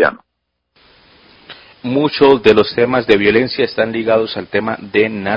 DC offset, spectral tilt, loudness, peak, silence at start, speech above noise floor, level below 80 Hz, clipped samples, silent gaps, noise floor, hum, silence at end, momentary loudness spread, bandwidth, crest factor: under 0.1%; -7 dB/octave; -14 LUFS; 0 dBFS; 0 s; 59 dB; -48 dBFS; 0.1%; none; -72 dBFS; none; 0 s; 9 LU; 7 kHz; 16 dB